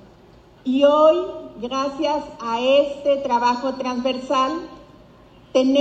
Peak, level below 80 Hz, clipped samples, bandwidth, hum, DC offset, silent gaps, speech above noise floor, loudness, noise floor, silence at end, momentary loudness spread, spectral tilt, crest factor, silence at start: -4 dBFS; -56 dBFS; under 0.1%; 8 kHz; none; under 0.1%; none; 29 dB; -20 LUFS; -49 dBFS; 0 s; 13 LU; -4 dB/octave; 16 dB; 0.65 s